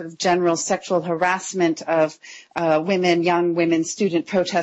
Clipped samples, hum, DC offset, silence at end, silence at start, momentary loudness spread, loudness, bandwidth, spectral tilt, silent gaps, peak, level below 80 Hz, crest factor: under 0.1%; none; under 0.1%; 0 s; 0 s; 4 LU; -20 LUFS; 8.2 kHz; -4.5 dB/octave; none; -8 dBFS; -68 dBFS; 14 dB